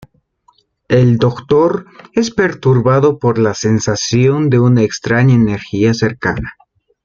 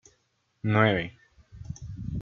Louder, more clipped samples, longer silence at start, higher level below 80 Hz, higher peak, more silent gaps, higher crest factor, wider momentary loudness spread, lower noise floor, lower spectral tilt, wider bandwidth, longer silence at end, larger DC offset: first, -13 LUFS vs -26 LUFS; neither; first, 0.9 s vs 0.65 s; first, -42 dBFS vs -50 dBFS; first, 0 dBFS vs -6 dBFS; neither; second, 12 dB vs 24 dB; second, 7 LU vs 19 LU; second, -55 dBFS vs -72 dBFS; about the same, -6.5 dB/octave vs -7 dB/octave; about the same, 7.4 kHz vs 7 kHz; first, 0.55 s vs 0 s; neither